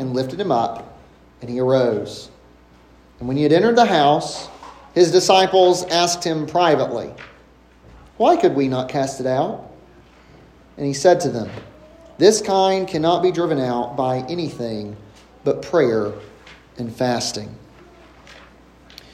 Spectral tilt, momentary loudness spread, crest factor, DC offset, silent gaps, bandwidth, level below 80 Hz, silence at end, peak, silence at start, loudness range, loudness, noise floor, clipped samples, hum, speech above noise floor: -4.5 dB/octave; 18 LU; 20 dB; under 0.1%; none; 14.5 kHz; -54 dBFS; 0.8 s; 0 dBFS; 0 s; 7 LU; -18 LUFS; -49 dBFS; under 0.1%; none; 31 dB